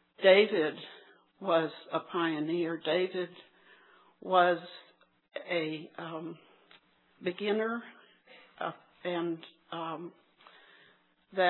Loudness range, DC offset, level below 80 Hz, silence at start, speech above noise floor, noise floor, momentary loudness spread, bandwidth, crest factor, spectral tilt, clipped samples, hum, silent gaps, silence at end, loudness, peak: 7 LU; under 0.1%; under -90 dBFS; 0.2 s; 35 dB; -65 dBFS; 20 LU; 4.3 kHz; 24 dB; -8 dB/octave; under 0.1%; none; none; 0 s; -31 LUFS; -8 dBFS